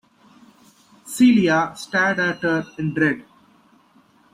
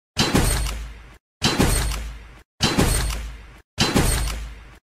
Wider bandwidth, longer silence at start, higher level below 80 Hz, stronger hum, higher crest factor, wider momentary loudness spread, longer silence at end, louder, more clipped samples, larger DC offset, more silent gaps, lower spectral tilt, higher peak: about the same, 15.5 kHz vs 16 kHz; first, 1.05 s vs 0.15 s; second, -60 dBFS vs -28 dBFS; neither; about the same, 16 dB vs 18 dB; second, 10 LU vs 19 LU; first, 1.1 s vs 0.1 s; first, -19 LUFS vs -22 LUFS; neither; neither; second, none vs 1.20-1.40 s, 2.45-2.58 s, 3.64-3.77 s; first, -5.5 dB/octave vs -3.5 dB/octave; about the same, -6 dBFS vs -6 dBFS